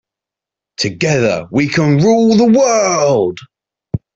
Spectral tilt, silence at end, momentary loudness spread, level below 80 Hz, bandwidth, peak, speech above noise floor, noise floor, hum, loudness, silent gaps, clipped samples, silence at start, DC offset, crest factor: -5.5 dB/octave; 0.2 s; 15 LU; -48 dBFS; 8 kHz; -2 dBFS; 74 dB; -85 dBFS; none; -12 LUFS; none; under 0.1%; 0.8 s; under 0.1%; 12 dB